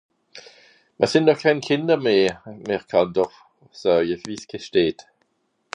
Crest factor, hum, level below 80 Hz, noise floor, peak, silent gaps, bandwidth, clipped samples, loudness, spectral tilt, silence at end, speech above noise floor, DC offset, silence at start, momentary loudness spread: 20 dB; none; -60 dBFS; -70 dBFS; -4 dBFS; none; 10.5 kHz; under 0.1%; -21 LUFS; -5.5 dB/octave; 0.8 s; 50 dB; under 0.1%; 0.35 s; 12 LU